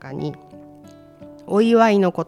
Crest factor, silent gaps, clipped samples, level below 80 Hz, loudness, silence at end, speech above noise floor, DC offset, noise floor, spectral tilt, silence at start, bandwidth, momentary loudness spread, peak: 18 dB; none; under 0.1%; -62 dBFS; -17 LUFS; 0.05 s; 27 dB; under 0.1%; -44 dBFS; -7 dB/octave; 0.05 s; 12 kHz; 16 LU; -4 dBFS